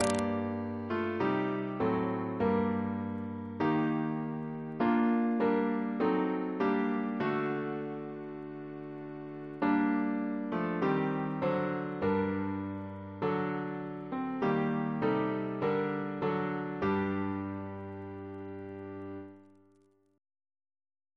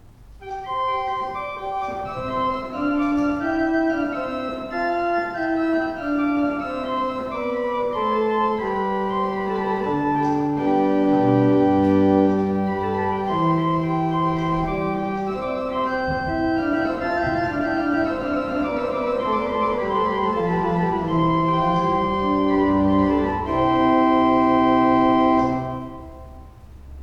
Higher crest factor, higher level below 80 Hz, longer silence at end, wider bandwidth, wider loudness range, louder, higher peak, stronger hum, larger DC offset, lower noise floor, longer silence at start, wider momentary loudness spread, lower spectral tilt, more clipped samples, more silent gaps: first, 22 dB vs 14 dB; second, -68 dBFS vs -44 dBFS; first, 1.75 s vs 0 s; first, 11 kHz vs 7.4 kHz; about the same, 6 LU vs 5 LU; second, -33 LUFS vs -21 LUFS; second, -10 dBFS vs -6 dBFS; neither; neither; first, -67 dBFS vs -41 dBFS; second, 0 s vs 0.2 s; first, 14 LU vs 9 LU; about the same, -7.5 dB/octave vs -8 dB/octave; neither; neither